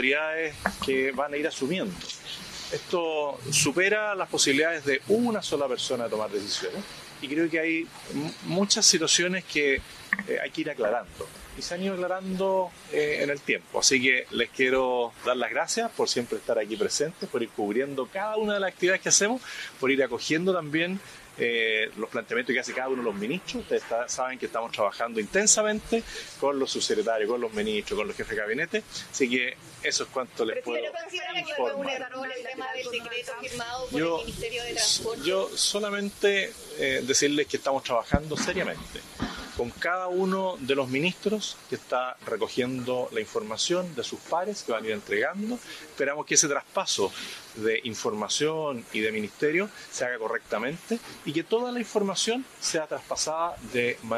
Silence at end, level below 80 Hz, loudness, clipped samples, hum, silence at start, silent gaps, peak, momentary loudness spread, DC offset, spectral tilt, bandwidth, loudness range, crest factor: 0 s; -56 dBFS; -27 LUFS; under 0.1%; none; 0 s; none; -4 dBFS; 11 LU; under 0.1%; -2.5 dB/octave; 14.5 kHz; 5 LU; 24 dB